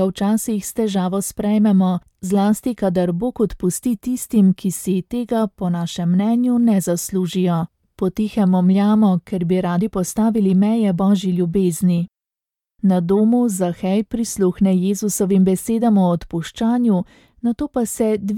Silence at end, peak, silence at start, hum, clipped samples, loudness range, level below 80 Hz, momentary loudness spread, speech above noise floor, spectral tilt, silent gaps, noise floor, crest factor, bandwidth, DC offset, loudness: 0 s; -6 dBFS; 0 s; none; under 0.1%; 2 LU; -48 dBFS; 7 LU; 70 dB; -7 dB/octave; none; -88 dBFS; 12 dB; 16.5 kHz; under 0.1%; -18 LUFS